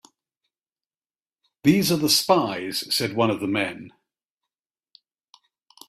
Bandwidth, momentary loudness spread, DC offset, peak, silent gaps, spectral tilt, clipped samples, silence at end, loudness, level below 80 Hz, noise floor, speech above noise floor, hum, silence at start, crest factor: 16 kHz; 9 LU; under 0.1%; -4 dBFS; none; -4 dB/octave; under 0.1%; 2 s; -22 LUFS; -62 dBFS; under -90 dBFS; over 68 dB; none; 1.65 s; 22 dB